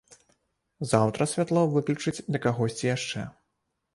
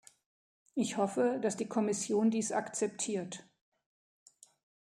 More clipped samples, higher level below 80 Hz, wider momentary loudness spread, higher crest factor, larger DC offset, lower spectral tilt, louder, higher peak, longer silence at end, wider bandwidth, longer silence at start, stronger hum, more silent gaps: neither; first, -62 dBFS vs -82 dBFS; about the same, 10 LU vs 9 LU; about the same, 22 dB vs 18 dB; neither; about the same, -5.5 dB/octave vs -4.5 dB/octave; first, -27 LUFS vs -33 LUFS; first, -6 dBFS vs -18 dBFS; second, 0.65 s vs 1.45 s; second, 11.5 kHz vs 13.5 kHz; about the same, 0.8 s vs 0.75 s; neither; neither